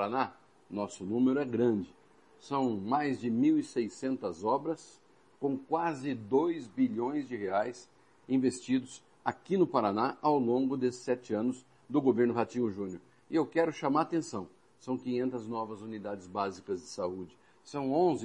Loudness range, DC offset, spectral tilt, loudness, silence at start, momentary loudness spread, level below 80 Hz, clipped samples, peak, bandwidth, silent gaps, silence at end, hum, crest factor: 4 LU; under 0.1%; -6.5 dB/octave; -32 LUFS; 0 s; 12 LU; -76 dBFS; under 0.1%; -12 dBFS; 10 kHz; none; 0 s; none; 20 dB